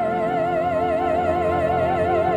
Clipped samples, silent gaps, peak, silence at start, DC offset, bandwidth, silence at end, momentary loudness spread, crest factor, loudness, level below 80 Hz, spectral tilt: under 0.1%; none; -10 dBFS; 0 s; under 0.1%; 9.4 kHz; 0 s; 1 LU; 10 dB; -21 LUFS; -44 dBFS; -7.5 dB/octave